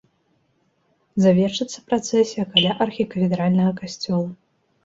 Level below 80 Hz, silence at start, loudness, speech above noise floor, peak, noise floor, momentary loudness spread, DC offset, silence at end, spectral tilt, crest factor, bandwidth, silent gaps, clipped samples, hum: -60 dBFS; 1.15 s; -21 LUFS; 46 dB; -2 dBFS; -66 dBFS; 9 LU; under 0.1%; 0.5 s; -5.5 dB/octave; 20 dB; 7.8 kHz; none; under 0.1%; none